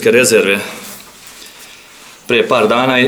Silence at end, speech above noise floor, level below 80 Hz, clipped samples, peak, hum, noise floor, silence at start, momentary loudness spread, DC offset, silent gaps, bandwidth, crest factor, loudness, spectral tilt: 0 s; 27 dB; -58 dBFS; under 0.1%; 0 dBFS; none; -39 dBFS; 0 s; 25 LU; under 0.1%; none; over 20 kHz; 14 dB; -12 LUFS; -3 dB/octave